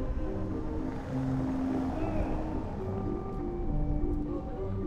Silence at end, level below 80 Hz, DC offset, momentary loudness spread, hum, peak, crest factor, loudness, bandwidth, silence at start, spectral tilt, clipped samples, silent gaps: 0 s; -36 dBFS; under 0.1%; 5 LU; none; -18 dBFS; 14 dB; -34 LUFS; 7.8 kHz; 0 s; -9.5 dB/octave; under 0.1%; none